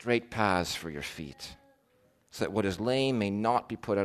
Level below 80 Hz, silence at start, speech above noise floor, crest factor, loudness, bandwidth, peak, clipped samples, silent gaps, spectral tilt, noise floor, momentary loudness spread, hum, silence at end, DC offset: -58 dBFS; 0 s; 37 dB; 20 dB; -30 LUFS; 13.5 kHz; -10 dBFS; under 0.1%; none; -5 dB/octave; -68 dBFS; 14 LU; none; 0 s; under 0.1%